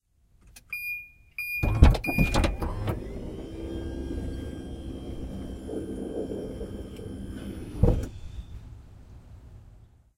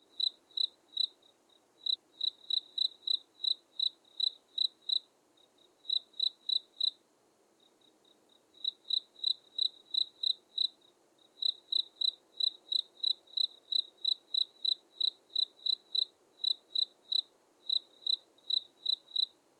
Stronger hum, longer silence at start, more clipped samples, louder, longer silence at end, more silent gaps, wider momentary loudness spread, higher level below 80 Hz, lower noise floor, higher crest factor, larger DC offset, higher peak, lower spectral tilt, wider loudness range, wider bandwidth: neither; first, 0.45 s vs 0.2 s; neither; first, -30 LUFS vs -33 LUFS; about the same, 0.4 s vs 0.3 s; neither; first, 21 LU vs 3 LU; first, -32 dBFS vs under -90 dBFS; second, -59 dBFS vs -70 dBFS; first, 28 dB vs 16 dB; neither; first, 0 dBFS vs -20 dBFS; first, -6.5 dB/octave vs 1.5 dB/octave; first, 9 LU vs 4 LU; first, 15.5 kHz vs 12 kHz